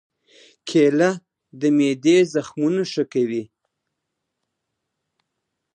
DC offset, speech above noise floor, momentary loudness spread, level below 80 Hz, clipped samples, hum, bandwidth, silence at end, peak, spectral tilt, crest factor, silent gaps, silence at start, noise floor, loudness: under 0.1%; 61 dB; 9 LU; -74 dBFS; under 0.1%; none; 9.6 kHz; 2.3 s; -6 dBFS; -5.5 dB/octave; 18 dB; none; 0.65 s; -79 dBFS; -20 LUFS